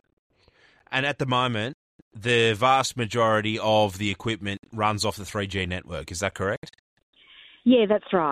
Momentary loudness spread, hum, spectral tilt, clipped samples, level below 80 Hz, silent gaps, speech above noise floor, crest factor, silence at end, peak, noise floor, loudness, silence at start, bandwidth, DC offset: 11 LU; none; -4.5 dB/octave; under 0.1%; -56 dBFS; 1.74-2.11 s, 4.59-4.63 s, 6.57-6.62 s, 6.79-6.97 s, 7.03-7.13 s; 36 dB; 18 dB; 0 s; -8 dBFS; -60 dBFS; -24 LUFS; 0.9 s; 15.5 kHz; under 0.1%